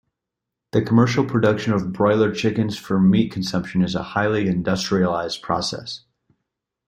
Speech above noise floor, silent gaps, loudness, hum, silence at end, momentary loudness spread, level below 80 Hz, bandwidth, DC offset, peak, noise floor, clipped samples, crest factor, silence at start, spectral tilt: 64 dB; none; -20 LUFS; none; 0.9 s; 7 LU; -52 dBFS; 10 kHz; under 0.1%; -4 dBFS; -83 dBFS; under 0.1%; 18 dB; 0.75 s; -6.5 dB/octave